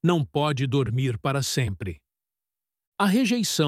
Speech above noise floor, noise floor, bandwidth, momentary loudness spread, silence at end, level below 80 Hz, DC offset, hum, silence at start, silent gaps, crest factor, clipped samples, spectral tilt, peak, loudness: over 66 dB; under -90 dBFS; 16 kHz; 10 LU; 0 s; -54 dBFS; under 0.1%; none; 0.05 s; 2.87-2.92 s; 18 dB; under 0.1%; -5 dB/octave; -6 dBFS; -24 LUFS